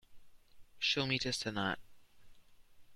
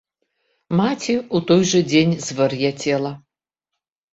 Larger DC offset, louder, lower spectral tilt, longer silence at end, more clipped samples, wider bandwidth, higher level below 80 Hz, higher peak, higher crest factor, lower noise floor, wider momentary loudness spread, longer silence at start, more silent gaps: neither; second, -35 LUFS vs -19 LUFS; second, -3.5 dB/octave vs -5 dB/octave; second, 0 s vs 0.95 s; neither; first, 15.5 kHz vs 8.2 kHz; second, -66 dBFS vs -56 dBFS; second, -18 dBFS vs -4 dBFS; about the same, 22 dB vs 18 dB; second, -58 dBFS vs -83 dBFS; about the same, 6 LU vs 8 LU; second, 0.1 s vs 0.7 s; neither